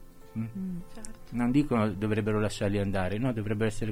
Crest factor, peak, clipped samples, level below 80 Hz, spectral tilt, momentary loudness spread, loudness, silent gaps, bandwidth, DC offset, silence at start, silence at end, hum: 16 dB; -14 dBFS; under 0.1%; -44 dBFS; -7 dB/octave; 13 LU; -30 LUFS; none; 15.5 kHz; under 0.1%; 0 s; 0 s; none